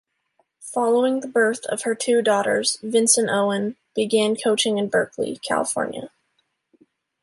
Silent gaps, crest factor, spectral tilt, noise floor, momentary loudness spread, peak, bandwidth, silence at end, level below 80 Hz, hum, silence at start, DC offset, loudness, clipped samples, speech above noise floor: none; 18 dB; -2.5 dB/octave; -71 dBFS; 10 LU; -4 dBFS; 12 kHz; 1.15 s; -70 dBFS; none; 0.6 s; under 0.1%; -21 LUFS; under 0.1%; 50 dB